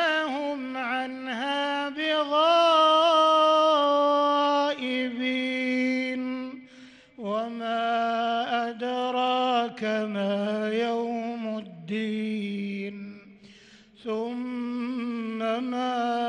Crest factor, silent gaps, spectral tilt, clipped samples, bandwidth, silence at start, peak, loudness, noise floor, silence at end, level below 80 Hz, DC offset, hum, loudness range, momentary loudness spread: 16 dB; none; -4.5 dB/octave; under 0.1%; 10 kHz; 0 s; -10 dBFS; -26 LUFS; -53 dBFS; 0 s; -76 dBFS; under 0.1%; none; 12 LU; 14 LU